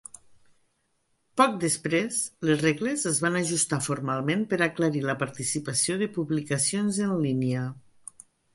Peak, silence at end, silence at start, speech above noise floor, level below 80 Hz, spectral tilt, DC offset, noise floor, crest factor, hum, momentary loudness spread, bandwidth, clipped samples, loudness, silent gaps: -6 dBFS; 0.75 s; 1.35 s; 46 dB; -66 dBFS; -4 dB/octave; under 0.1%; -72 dBFS; 22 dB; none; 8 LU; 12 kHz; under 0.1%; -26 LUFS; none